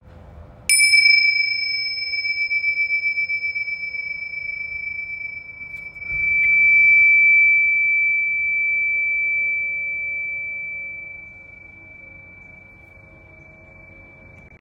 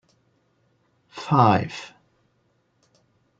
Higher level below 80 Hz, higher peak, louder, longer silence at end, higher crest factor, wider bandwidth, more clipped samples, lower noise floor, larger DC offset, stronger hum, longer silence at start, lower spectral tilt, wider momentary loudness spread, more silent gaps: first, -54 dBFS vs -64 dBFS; about the same, -4 dBFS vs -4 dBFS; first, -16 LUFS vs -20 LUFS; second, 0.15 s vs 1.55 s; second, 18 dB vs 24 dB; first, 16 kHz vs 7.8 kHz; neither; second, -46 dBFS vs -68 dBFS; neither; neither; second, 0.05 s vs 1.15 s; second, 1.5 dB/octave vs -7 dB/octave; second, 18 LU vs 26 LU; neither